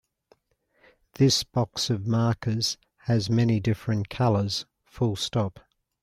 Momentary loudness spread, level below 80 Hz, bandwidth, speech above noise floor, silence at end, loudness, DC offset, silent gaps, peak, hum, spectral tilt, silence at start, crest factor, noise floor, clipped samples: 7 LU; -56 dBFS; 14 kHz; 45 dB; 0.45 s; -26 LUFS; under 0.1%; none; -10 dBFS; none; -5.5 dB/octave; 1.2 s; 16 dB; -69 dBFS; under 0.1%